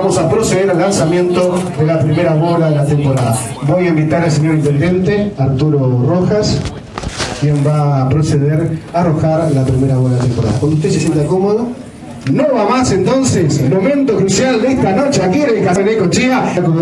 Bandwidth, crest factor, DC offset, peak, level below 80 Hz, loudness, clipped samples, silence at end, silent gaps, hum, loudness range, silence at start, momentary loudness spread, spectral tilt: 12 kHz; 12 dB; under 0.1%; 0 dBFS; -38 dBFS; -13 LUFS; under 0.1%; 0 s; none; none; 2 LU; 0 s; 4 LU; -6.5 dB/octave